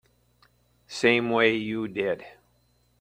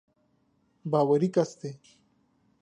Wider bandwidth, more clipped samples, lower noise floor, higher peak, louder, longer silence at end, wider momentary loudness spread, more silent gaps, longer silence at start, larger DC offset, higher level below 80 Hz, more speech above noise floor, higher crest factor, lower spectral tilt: first, 16 kHz vs 9.8 kHz; neither; second, -66 dBFS vs -70 dBFS; first, -6 dBFS vs -12 dBFS; about the same, -25 LUFS vs -26 LUFS; second, 0.7 s vs 0.85 s; second, 11 LU vs 18 LU; neither; about the same, 0.9 s vs 0.85 s; neither; first, -66 dBFS vs -76 dBFS; about the same, 42 dB vs 44 dB; about the same, 22 dB vs 18 dB; second, -5 dB/octave vs -7.5 dB/octave